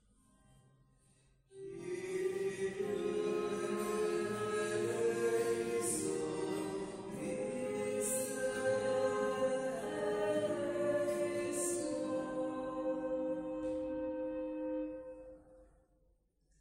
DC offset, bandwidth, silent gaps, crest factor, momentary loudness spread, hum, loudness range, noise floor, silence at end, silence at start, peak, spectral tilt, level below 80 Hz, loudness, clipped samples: under 0.1%; 16 kHz; none; 14 dB; 7 LU; none; 5 LU; -74 dBFS; 0.95 s; 1.5 s; -22 dBFS; -4.5 dB/octave; -68 dBFS; -37 LUFS; under 0.1%